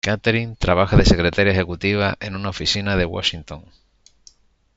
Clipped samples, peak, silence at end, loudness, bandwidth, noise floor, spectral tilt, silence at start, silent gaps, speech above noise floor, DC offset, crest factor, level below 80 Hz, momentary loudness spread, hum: under 0.1%; -2 dBFS; 1.15 s; -19 LUFS; 8 kHz; -53 dBFS; -5.5 dB/octave; 0.05 s; none; 34 dB; under 0.1%; 18 dB; -30 dBFS; 12 LU; none